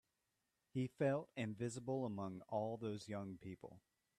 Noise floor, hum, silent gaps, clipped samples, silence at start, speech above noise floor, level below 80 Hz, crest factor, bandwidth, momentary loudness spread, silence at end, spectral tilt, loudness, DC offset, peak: -88 dBFS; none; none; under 0.1%; 0.75 s; 44 dB; -80 dBFS; 18 dB; 13 kHz; 13 LU; 0.4 s; -7 dB/octave; -45 LUFS; under 0.1%; -28 dBFS